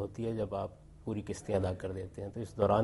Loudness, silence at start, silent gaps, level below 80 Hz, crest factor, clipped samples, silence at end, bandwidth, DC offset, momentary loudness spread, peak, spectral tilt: -37 LUFS; 0 s; none; -56 dBFS; 20 dB; under 0.1%; 0 s; 11.5 kHz; under 0.1%; 9 LU; -14 dBFS; -7.5 dB/octave